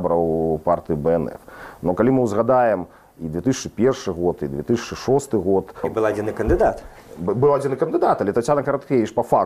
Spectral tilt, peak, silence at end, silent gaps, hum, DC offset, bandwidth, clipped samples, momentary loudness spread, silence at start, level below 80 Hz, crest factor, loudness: -7 dB/octave; -4 dBFS; 0 s; none; none; under 0.1%; 15 kHz; under 0.1%; 9 LU; 0 s; -40 dBFS; 16 dB; -21 LUFS